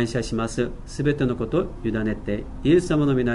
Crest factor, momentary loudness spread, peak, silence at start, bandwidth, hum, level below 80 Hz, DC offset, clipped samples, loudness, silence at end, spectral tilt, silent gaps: 16 dB; 8 LU; -6 dBFS; 0 s; 11.5 kHz; none; -38 dBFS; under 0.1%; under 0.1%; -24 LUFS; 0 s; -7 dB/octave; none